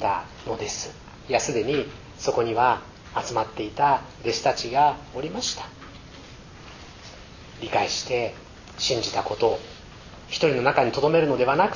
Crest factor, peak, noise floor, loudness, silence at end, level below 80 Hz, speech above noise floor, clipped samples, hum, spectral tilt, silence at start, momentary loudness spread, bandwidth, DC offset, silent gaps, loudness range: 20 dB; -4 dBFS; -44 dBFS; -24 LUFS; 0 s; -50 dBFS; 20 dB; under 0.1%; none; -4 dB/octave; 0 s; 22 LU; 7.4 kHz; under 0.1%; none; 6 LU